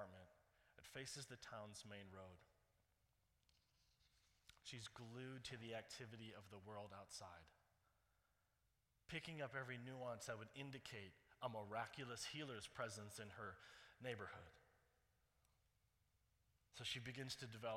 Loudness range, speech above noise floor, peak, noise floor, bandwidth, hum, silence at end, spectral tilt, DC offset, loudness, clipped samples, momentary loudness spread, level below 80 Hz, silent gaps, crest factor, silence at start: 8 LU; 32 dB; -34 dBFS; -86 dBFS; 16 kHz; none; 0 s; -3.5 dB/octave; under 0.1%; -54 LUFS; under 0.1%; 12 LU; -82 dBFS; none; 22 dB; 0 s